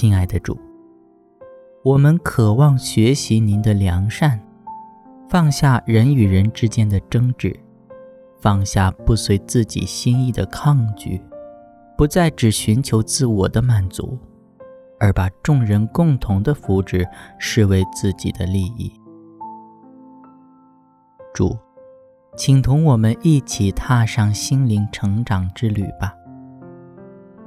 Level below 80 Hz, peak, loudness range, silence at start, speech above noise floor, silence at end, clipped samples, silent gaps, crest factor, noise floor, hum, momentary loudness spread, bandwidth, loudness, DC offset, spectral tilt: -36 dBFS; -2 dBFS; 6 LU; 0 s; 37 dB; 0 s; under 0.1%; none; 16 dB; -53 dBFS; none; 14 LU; 14 kHz; -18 LUFS; under 0.1%; -6.5 dB/octave